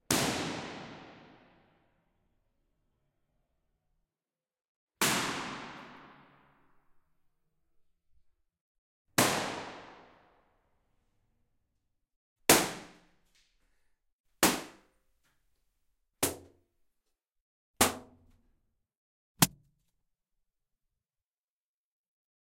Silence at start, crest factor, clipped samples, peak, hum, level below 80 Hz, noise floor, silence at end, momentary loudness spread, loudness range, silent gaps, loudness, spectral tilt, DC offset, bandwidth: 0.1 s; 34 dB; under 0.1%; -4 dBFS; none; -66 dBFS; under -90 dBFS; 3 s; 24 LU; 9 LU; 4.68-4.87 s, 8.61-9.05 s, 12.16-12.36 s, 14.13-14.24 s, 17.41-17.74 s, 18.97-19.35 s; -30 LUFS; -2.5 dB/octave; under 0.1%; 16.5 kHz